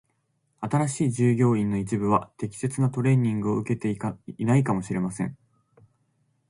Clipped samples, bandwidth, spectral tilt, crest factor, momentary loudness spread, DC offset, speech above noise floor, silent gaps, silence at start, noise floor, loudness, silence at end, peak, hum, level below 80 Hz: under 0.1%; 11.5 kHz; -7.5 dB/octave; 18 dB; 10 LU; under 0.1%; 48 dB; none; 0.6 s; -72 dBFS; -25 LUFS; 1.15 s; -8 dBFS; none; -58 dBFS